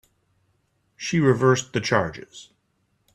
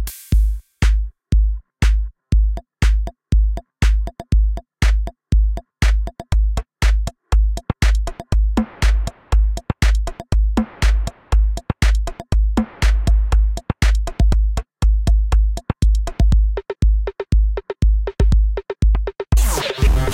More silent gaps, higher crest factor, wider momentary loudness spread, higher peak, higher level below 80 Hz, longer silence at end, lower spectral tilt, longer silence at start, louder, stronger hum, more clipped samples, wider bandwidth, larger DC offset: neither; first, 22 dB vs 12 dB; first, 23 LU vs 5 LU; about the same, -4 dBFS vs -4 dBFS; second, -58 dBFS vs -16 dBFS; first, 0.75 s vs 0 s; about the same, -5.5 dB/octave vs -6 dB/octave; first, 1 s vs 0 s; about the same, -22 LUFS vs -20 LUFS; neither; neither; second, 10.5 kHz vs 14 kHz; neither